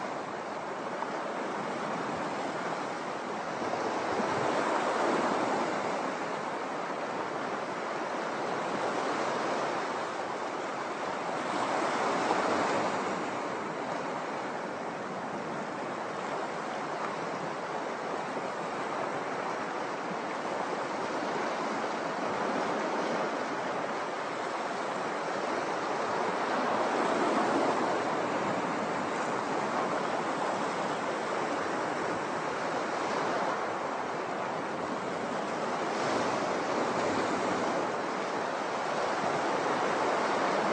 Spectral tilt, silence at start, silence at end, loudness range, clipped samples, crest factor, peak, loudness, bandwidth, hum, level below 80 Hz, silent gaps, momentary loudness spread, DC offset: -4 dB/octave; 0 s; 0 s; 5 LU; under 0.1%; 20 dB; -12 dBFS; -32 LUFS; 9.6 kHz; none; -74 dBFS; none; 6 LU; under 0.1%